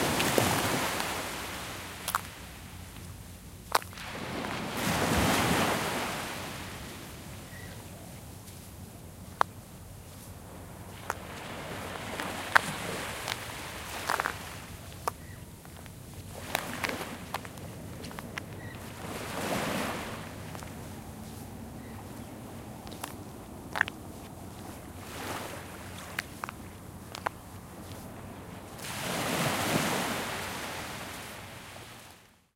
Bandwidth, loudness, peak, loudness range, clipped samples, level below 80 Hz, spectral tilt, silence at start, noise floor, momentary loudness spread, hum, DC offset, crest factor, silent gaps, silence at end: 16.5 kHz; -34 LUFS; 0 dBFS; 10 LU; under 0.1%; -54 dBFS; -3.5 dB/octave; 0 s; -55 dBFS; 18 LU; none; under 0.1%; 34 dB; none; 0.25 s